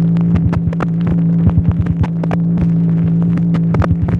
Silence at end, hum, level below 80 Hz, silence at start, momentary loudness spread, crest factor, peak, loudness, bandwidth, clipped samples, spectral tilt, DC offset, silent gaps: 0 s; none; -28 dBFS; 0 s; 3 LU; 12 dB; -2 dBFS; -14 LUFS; 3.7 kHz; under 0.1%; -10.5 dB/octave; under 0.1%; none